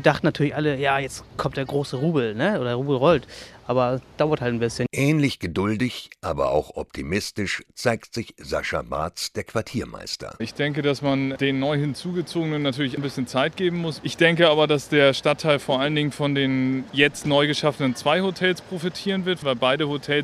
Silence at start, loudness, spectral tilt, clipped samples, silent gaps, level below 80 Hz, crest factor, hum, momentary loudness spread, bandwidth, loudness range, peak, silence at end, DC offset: 0 s; -23 LUFS; -5.5 dB/octave; under 0.1%; none; -52 dBFS; 22 dB; none; 10 LU; 14 kHz; 6 LU; -2 dBFS; 0 s; under 0.1%